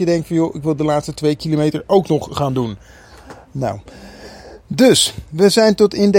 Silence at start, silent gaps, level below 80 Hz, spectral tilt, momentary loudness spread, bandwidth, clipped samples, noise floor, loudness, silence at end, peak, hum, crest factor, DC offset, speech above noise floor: 0 s; none; -44 dBFS; -5 dB/octave; 20 LU; 16.5 kHz; under 0.1%; -40 dBFS; -16 LUFS; 0 s; 0 dBFS; none; 16 dB; under 0.1%; 24 dB